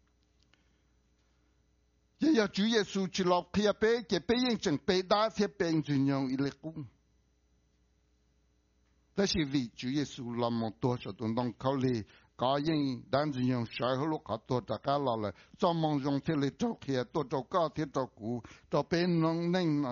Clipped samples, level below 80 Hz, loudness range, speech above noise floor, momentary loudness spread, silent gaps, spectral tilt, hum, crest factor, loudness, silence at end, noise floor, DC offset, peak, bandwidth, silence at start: under 0.1%; -62 dBFS; 7 LU; 40 dB; 8 LU; none; -5 dB/octave; none; 20 dB; -32 LUFS; 0 s; -71 dBFS; under 0.1%; -14 dBFS; 7.2 kHz; 2.2 s